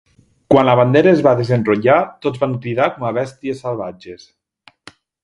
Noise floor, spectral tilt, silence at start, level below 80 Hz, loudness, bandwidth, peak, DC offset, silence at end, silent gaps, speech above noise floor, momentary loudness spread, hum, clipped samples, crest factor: -52 dBFS; -8 dB/octave; 0.5 s; -54 dBFS; -16 LUFS; 11 kHz; 0 dBFS; under 0.1%; 1.1 s; none; 37 dB; 14 LU; none; under 0.1%; 16 dB